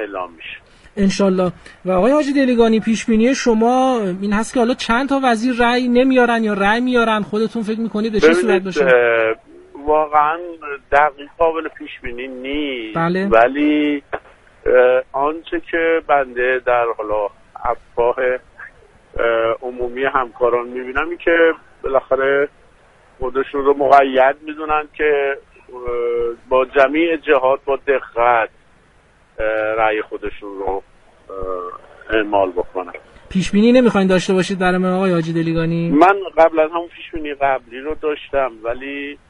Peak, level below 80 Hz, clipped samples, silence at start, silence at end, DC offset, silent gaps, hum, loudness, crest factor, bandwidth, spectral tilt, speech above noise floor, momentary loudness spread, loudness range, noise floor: 0 dBFS; -42 dBFS; under 0.1%; 0 s; 0.15 s; under 0.1%; none; none; -17 LUFS; 16 dB; 11.5 kHz; -6 dB/octave; 36 dB; 14 LU; 5 LU; -52 dBFS